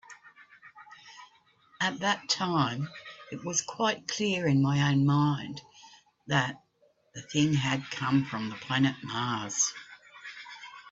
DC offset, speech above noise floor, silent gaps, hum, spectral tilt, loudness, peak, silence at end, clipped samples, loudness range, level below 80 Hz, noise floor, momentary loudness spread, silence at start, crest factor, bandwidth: under 0.1%; 39 dB; none; none; -4 dB/octave; -29 LUFS; -10 dBFS; 0 s; under 0.1%; 4 LU; -66 dBFS; -68 dBFS; 21 LU; 0.1 s; 20 dB; 8 kHz